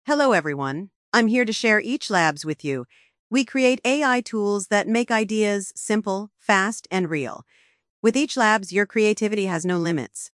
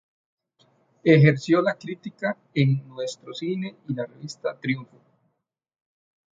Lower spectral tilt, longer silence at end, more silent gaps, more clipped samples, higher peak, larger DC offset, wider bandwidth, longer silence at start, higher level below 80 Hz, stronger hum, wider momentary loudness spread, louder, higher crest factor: second, -4 dB/octave vs -7.5 dB/octave; second, 0.1 s vs 1.55 s; first, 0.96-1.12 s, 3.19-3.30 s, 7.90-8.03 s vs none; neither; about the same, -4 dBFS vs -4 dBFS; neither; first, 12 kHz vs 7.8 kHz; second, 0.05 s vs 1.05 s; second, -74 dBFS vs -68 dBFS; neither; second, 9 LU vs 16 LU; about the same, -22 LUFS vs -24 LUFS; about the same, 18 dB vs 22 dB